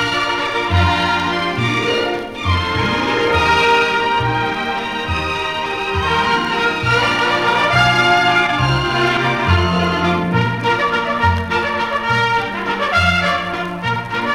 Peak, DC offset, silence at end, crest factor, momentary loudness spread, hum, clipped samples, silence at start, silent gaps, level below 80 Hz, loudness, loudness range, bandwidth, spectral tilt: -2 dBFS; under 0.1%; 0 s; 14 dB; 7 LU; none; under 0.1%; 0 s; none; -36 dBFS; -16 LUFS; 3 LU; 15 kHz; -5 dB/octave